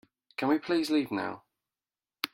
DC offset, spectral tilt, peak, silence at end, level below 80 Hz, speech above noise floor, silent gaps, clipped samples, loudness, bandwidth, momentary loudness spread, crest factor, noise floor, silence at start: under 0.1%; -4.5 dB/octave; -10 dBFS; 0.1 s; -76 dBFS; over 61 dB; none; under 0.1%; -30 LUFS; 16 kHz; 13 LU; 22 dB; under -90 dBFS; 0.4 s